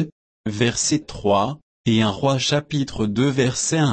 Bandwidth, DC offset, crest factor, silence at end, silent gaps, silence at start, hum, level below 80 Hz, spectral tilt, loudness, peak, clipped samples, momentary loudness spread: 8.8 kHz; under 0.1%; 14 dB; 0 s; 0.12-0.44 s, 1.62-1.84 s; 0 s; none; -48 dBFS; -4.5 dB/octave; -21 LUFS; -6 dBFS; under 0.1%; 8 LU